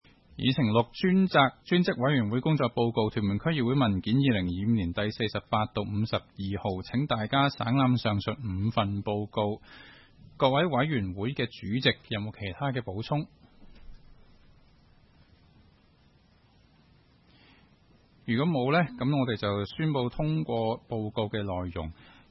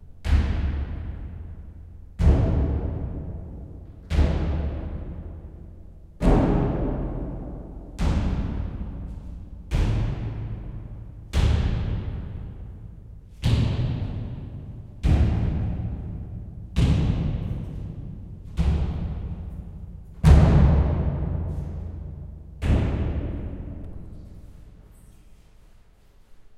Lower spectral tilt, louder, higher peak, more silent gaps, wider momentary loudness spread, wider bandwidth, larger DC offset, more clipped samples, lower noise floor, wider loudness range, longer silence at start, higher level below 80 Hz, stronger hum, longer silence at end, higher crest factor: about the same, -9 dB/octave vs -8 dB/octave; about the same, -28 LUFS vs -26 LUFS; second, -8 dBFS vs -4 dBFS; neither; second, 8 LU vs 20 LU; second, 6 kHz vs 9.6 kHz; neither; neither; first, -62 dBFS vs -53 dBFS; about the same, 7 LU vs 8 LU; first, 0.35 s vs 0 s; second, -56 dBFS vs -28 dBFS; neither; first, 0.4 s vs 0 s; about the same, 20 dB vs 22 dB